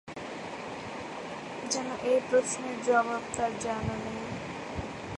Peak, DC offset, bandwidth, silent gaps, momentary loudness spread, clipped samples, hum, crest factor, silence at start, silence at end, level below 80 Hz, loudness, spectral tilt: -12 dBFS; under 0.1%; 11.5 kHz; none; 12 LU; under 0.1%; none; 20 dB; 0.05 s; 0 s; -54 dBFS; -32 LUFS; -4 dB/octave